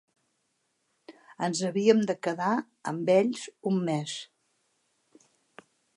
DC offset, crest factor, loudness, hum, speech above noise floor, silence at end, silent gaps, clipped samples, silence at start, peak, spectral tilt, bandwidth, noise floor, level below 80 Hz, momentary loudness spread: under 0.1%; 22 dB; -28 LUFS; none; 49 dB; 1.7 s; none; under 0.1%; 1.1 s; -8 dBFS; -5.5 dB/octave; 11.5 kHz; -76 dBFS; -82 dBFS; 11 LU